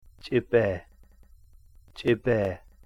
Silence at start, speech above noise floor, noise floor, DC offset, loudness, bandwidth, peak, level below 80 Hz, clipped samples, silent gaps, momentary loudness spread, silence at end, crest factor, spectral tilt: 0.25 s; 29 dB; -54 dBFS; under 0.1%; -27 LUFS; 11 kHz; -10 dBFS; -52 dBFS; under 0.1%; none; 7 LU; 0.3 s; 20 dB; -8 dB/octave